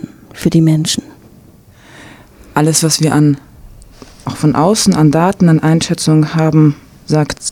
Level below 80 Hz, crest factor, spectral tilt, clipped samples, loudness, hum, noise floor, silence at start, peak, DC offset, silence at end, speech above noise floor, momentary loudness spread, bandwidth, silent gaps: -42 dBFS; 12 dB; -5.5 dB/octave; under 0.1%; -12 LUFS; none; -42 dBFS; 0 s; 0 dBFS; under 0.1%; 0 s; 31 dB; 10 LU; 15.5 kHz; none